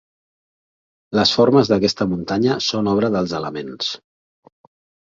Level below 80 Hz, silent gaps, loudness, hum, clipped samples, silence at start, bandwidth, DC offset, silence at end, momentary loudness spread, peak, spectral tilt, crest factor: -52 dBFS; none; -18 LUFS; none; under 0.1%; 1.1 s; 7.8 kHz; under 0.1%; 1.05 s; 11 LU; -2 dBFS; -5.5 dB/octave; 18 dB